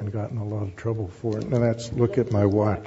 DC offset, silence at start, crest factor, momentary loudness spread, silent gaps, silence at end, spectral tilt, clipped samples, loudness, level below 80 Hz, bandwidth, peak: under 0.1%; 0 s; 16 dB; 8 LU; none; 0 s; -8 dB/octave; under 0.1%; -25 LUFS; -50 dBFS; 8 kHz; -8 dBFS